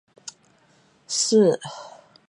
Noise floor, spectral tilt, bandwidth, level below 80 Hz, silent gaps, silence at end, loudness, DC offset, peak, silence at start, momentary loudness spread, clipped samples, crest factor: -59 dBFS; -4 dB/octave; 11.5 kHz; -76 dBFS; none; 0.4 s; -21 LUFS; under 0.1%; -6 dBFS; 0.25 s; 23 LU; under 0.1%; 18 dB